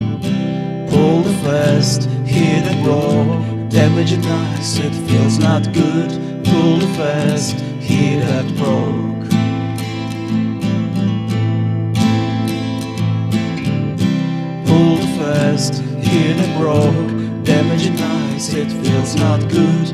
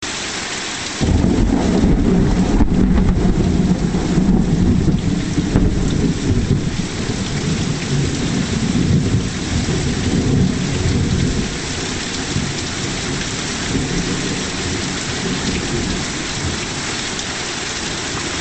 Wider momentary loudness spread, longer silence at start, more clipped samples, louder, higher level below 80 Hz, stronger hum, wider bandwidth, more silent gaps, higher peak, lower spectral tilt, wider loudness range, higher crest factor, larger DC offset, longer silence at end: about the same, 6 LU vs 6 LU; about the same, 0 s vs 0 s; neither; about the same, -16 LUFS vs -18 LUFS; second, -46 dBFS vs -26 dBFS; neither; first, 13.5 kHz vs 9 kHz; neither; about the same, 0 dBFS vs 0 dBFS; first, -6.5 dB/octave vs -5 dB/octave; about the same, 3 LU vs 5 LU; about the same, 14 dB vs 18 dB; second, under 0.1% vs 0.4%; about the same, 0 s vs 0 s